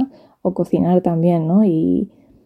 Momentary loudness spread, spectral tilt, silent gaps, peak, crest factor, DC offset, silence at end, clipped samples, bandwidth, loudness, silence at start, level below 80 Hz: 10 LU; -11 dB/octave; none; -2 dBFS; 14 dB; under 0.1%; 0.4 s; under 0.1%; 4.3 kHz; -17 LUFS; 0 s; -52 dBFS